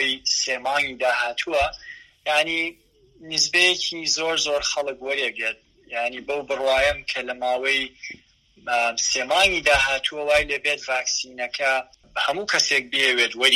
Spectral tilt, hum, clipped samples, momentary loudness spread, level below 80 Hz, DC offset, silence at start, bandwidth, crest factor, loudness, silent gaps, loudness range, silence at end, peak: -0.5 dB/octave; none; under 0.1%; 10 LU; -50 dBFS; under 0.1%; 0 s; 15 kHz; 22 dB; -21 LUFS; none; 3 LU; 0 s; -2 dBFS